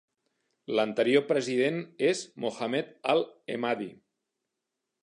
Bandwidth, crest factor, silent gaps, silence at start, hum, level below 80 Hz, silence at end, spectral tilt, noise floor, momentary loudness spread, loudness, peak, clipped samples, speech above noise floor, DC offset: 11 kHz; 20 dB; none; 0.7 s; none; -82 dBFS; 1.1 s; -4.5 dB/octave; -85 dBFS; 10 LU; -29 LUFS; -10 dBFS; under 0.1%; 57 dB; under 0.1%